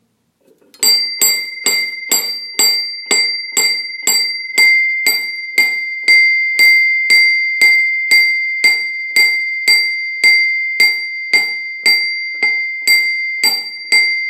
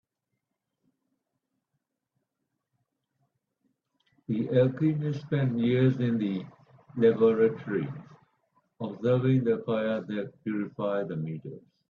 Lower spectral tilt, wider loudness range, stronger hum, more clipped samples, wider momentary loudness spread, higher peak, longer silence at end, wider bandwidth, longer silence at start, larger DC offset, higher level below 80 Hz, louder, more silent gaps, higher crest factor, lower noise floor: second, 3 dB/octave vs -10 dB/octave; about the same, 4 LU vs 5 LU; neither; neither; second, 7 LU vs 15 LU; first, 0 dBFS vs -12 dBFS; second, 0 s vs 0.3 s; first, 16 kHz vs 6.4 kHz; second, 0.8 s vs 4.3 s; neither; second, -78 dBFS vs -70 dBFS; first, -11 LUFS vs -28 LUFS; neither; about the same, 14 dB vs 18 dB; second, -58 dBFS vs -83 dBFS